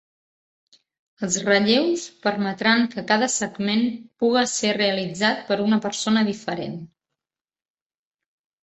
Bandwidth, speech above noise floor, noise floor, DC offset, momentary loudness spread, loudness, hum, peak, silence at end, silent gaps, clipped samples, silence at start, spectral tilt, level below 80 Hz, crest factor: 8.4 kHz; 67 dB; -89 dBFS; under 0.1%; 8 LU; -22 LUFS; none; -4 dBFS; 1.75 s; none; under 0.1%; 1.2 s; -3.5 dB/octave; -66 dBFS; 20 dB